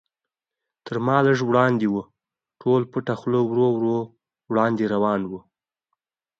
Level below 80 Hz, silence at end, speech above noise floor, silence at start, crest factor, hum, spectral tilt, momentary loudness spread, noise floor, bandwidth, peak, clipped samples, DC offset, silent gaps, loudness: -64 dBFS; 1 s; 67 dB; 0.85 s; 20 dB; none; -8 dB/octave; 11 LU; -88 dBFS; 7.4 kHz; -4 dBFS; under 0.1%; under 0.1%; none; -22 LUFS